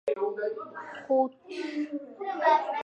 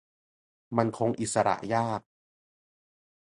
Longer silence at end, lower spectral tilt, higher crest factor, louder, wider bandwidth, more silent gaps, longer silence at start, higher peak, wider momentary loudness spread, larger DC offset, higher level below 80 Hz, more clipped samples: second, 0 s vs 1.3 s; about the same, -4.5 dB/octave vs -5.5 dB/octave; second, 18 dB vs 24 dB; about the same, -30 LUFS vs -29 LUFS; second, 8.8 kHz vs 11.5 kHz; neither; second, 0.05 s vs 0.7 s; about the same, -10 dBFS vs -8 dBFS; first, 14 LU vs 6 LU; neither; second, -84 dBFS vs -66 dBFS; neither